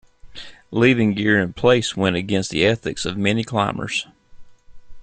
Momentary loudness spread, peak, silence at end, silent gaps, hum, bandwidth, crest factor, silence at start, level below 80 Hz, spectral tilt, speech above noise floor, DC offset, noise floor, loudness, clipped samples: 12 LU; -2 dBFS; 0 s; none; none; 9.4 kHz; 18 dB; 0.25 s; -48 dBFS; -5 dB/octave; 21 dB; under 0.1%; -40 dBFS; -19 LUFS; under 0.1%